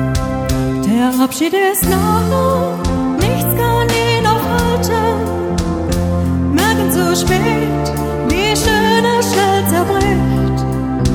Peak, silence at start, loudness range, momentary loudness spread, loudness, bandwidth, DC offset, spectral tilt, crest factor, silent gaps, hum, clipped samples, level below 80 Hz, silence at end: 0 dBFS; 0 s; 1 LU; 5 LU; -14 LUFS; over 20 kHz; under 0.1%; -5 dB/octave; 14 dB; none; none; under 0.1%; -26 dBFS; 0 s